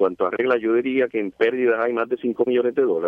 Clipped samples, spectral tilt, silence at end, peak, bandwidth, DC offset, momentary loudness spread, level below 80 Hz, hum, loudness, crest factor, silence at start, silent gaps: under 0.1%; -7.5 dB/octave; 0 s; -6 dBFS; 4.7 kHz; under 0.1%; 4 LU; -68 dBFS; none; -21 LUFS; 14 dB; 0 s; none